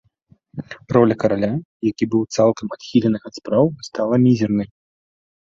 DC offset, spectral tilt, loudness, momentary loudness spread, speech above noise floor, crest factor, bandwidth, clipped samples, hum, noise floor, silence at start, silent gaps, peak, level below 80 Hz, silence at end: under 0.1%; -7.5 dB/octave; -19 LUFS; 15 LU; 39 dB; 18 dB; 7.6 kHz; under 0.1%; none; -57 dBFS; 0.55 s; 1.65-1.80 s; -2 dBFS; -54 dBFS; 0.8 s